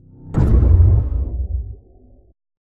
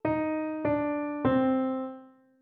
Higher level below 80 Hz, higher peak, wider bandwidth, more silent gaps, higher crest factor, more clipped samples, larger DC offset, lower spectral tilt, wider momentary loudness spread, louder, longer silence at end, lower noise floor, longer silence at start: first, -20 dBFS vs -62 dBFS; first, -2 dBFS vs -14 dBFS; second, 2.4 kHz vs 4.3 kHz; neither; about the same, 16 dB vs 16 dB; neither; neither; about the same, -11 dB/octave vs -10.5 dB/octave; first, 14 LU vs 10 LU; first, -17 LUFS vs -29 LUFS; first, 0.85 s vs 0.35 s; about the same, -48 dBFS vs -50 dBFS; first, 0.25 s vs 0.05 s